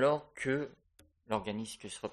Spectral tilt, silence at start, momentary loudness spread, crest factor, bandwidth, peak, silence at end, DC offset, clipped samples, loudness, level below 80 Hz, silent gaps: -5 dB/octave; 0 s; 9 LU; 18 dB; 12.5 kHz; -16 dBFS; 0 s; under 0.1%; under 0.1%; -37 LUFS; -66 dBFS; none